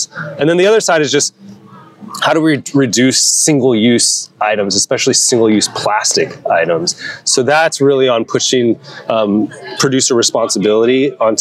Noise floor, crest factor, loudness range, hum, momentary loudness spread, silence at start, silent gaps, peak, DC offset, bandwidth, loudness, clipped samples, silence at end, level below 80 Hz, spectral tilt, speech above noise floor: -38 dBFS; 12 dB; 2 LU; none; 7 LU; 0 s; none; 0 dBFS; under 0.1%; 15.5 kHz; -12 LUFS; under 0.1%; 0 s; -64 dBFS; -3 dB/octave; 26 dB